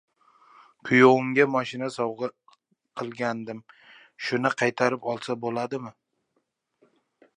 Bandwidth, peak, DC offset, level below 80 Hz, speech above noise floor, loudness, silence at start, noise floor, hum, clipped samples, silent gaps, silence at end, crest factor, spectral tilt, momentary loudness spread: 10.5 kHz; -4 dBFS; under 0.1%; -74 dBFS; 51 dB; -25 LUFS; 0.85 s; -76 dBFS; none; under 0.1%; none; 1.45 s; 24 dB; -5.5 dB/octave; 19 LU